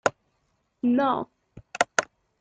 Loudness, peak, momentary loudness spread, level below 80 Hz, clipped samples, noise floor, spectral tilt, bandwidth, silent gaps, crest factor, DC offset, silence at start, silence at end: -26 LUFS; 0 dBFS; 18 LU; -66 dBFS; under 0.1%; -72 dBFS; -3.5 dB/octave; 9.4 kHz; none; 28 dB; under 0.1%; 0.05 s; 0.35 s